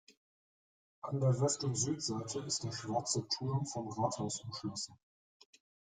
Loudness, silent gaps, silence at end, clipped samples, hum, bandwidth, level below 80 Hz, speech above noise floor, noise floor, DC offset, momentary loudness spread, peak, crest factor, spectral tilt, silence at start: -36 LUFS; 0.17-1.02 s; 1.05 s; under 0.1%; none; 9.6 kHz; -72 dBFS; over 54 dB; under -90 dBFS; under 0.1%; 9 LU; -20 dBFS; 18 dB; -4.5 dB/octave; 0.1 s